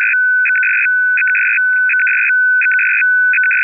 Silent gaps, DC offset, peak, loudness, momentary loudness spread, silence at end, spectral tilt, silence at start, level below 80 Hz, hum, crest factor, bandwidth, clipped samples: none; under 0.1%; -8 dBFS; -11 LUFS; 1 LU; 0 s; 4 dB/octave; 0 s; under -90 dBFS; none; 4 dB; 2.9 kHz; under 0.1%